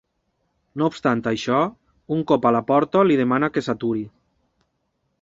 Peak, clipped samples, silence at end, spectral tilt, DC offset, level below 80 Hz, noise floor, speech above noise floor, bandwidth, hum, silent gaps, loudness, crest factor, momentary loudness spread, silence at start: -4 dBFS; under 0.1%; 1.15 s; -7 dB/octave; under 0.1%; -60 dBFS; -72 dBFS; 52 dB; 7.8 kHz; none; none; -21 LUFS; 18 dB; 9 LU; 0.75 s